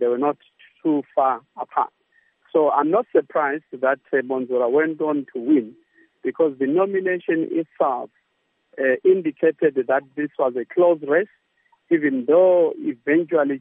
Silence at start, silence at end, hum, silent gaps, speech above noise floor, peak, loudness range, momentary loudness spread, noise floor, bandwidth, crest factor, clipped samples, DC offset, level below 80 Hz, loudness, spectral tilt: 0 s; 0 s; none; none; 50 dB; -4 dBFS; 3 LU; 9 LU; -70 dBFS; 3.7 kHz; 16 dB; under 0.1%; under 0.1%; -82 dBFS; -21 LUFS; -10.5 dB/octave